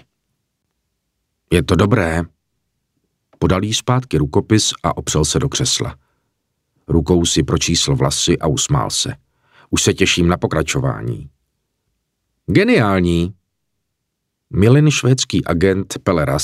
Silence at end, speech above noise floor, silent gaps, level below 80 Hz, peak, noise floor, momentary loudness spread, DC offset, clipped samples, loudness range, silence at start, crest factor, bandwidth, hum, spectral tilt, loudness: 0 s; 59 dB; none; -36 dBFS; 0 dBFS; -75 dBFS; 8 LU; under 0.1%; under 0.1%; 3 LU; 1.5 s; 18 dB; 15.5 kHz; none; -4.5 dB/octave; -16 LUFS